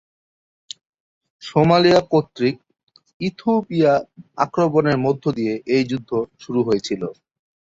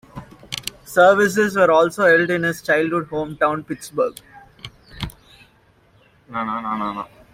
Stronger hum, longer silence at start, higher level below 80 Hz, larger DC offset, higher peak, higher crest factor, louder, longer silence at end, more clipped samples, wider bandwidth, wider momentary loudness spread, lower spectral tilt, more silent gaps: neither; first, 1.4 s vs 0.15 s; second, -56 dBFS vs -50 dBFS; neither; about the same, -2 dBFS vs -2 dBFS; about the same, 18 dB vs 18 dB; about the same, -19 LUFS vs -19 LUFS; first, 0.6 s vs 0.3 s; neither; second, 7.8 kHz vs 16 kHz; first, 22 LU vs 19 LU; first, -6.5 dB/octave vs -4.5 dB/octave; first, 2.83-2.87 s, 3.14-3.20 s vs none